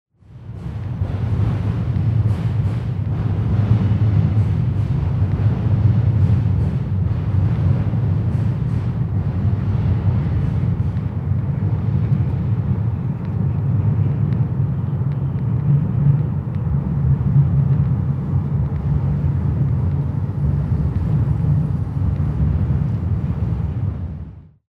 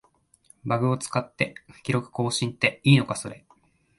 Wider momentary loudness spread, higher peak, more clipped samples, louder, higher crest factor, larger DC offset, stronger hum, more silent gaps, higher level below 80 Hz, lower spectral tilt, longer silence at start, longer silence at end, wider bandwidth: second, 6 LU vs 13 LU; about the same, -4 dBFS vs -4 dBFS; neither; first, -19 LUFS vs -25 LUFS; second, 14 dB vs 22 dB; first, 0.1% vs under 0.1%; neither; neither; first, -30 dBFS vs -62 dBFS; first, -11 dB/octave vs -5 dB/octave; second, 0.3 s vs 0.65 s; second, 0.3 s vs 0.6 s; second, 4.7 kHz vs 11.5 kHz